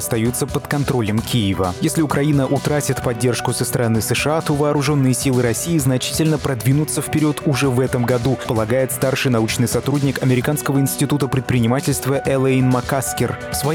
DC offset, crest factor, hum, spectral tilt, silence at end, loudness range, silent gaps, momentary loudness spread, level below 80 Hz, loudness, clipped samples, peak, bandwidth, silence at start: under 0.1%; 12 dB; none; -5.5 dB/octave; 0 s; 1 LU; none; 3 LU; -44 dBFS; -18 LUFS; under 0.1%; -6 dBFS; 18.5 kHz; 0 s